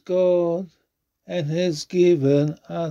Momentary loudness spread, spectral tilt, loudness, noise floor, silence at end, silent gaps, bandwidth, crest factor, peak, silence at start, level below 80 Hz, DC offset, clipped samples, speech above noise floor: 12 LU; -7 dB/octave; -21 LUFS; -73 dBFS; 0 s; none; 9.6 kHz; 14 dB; -8 dBFS; 0.1 s; -66 dBFS; under 0.1%; under 0.1%; 53 dB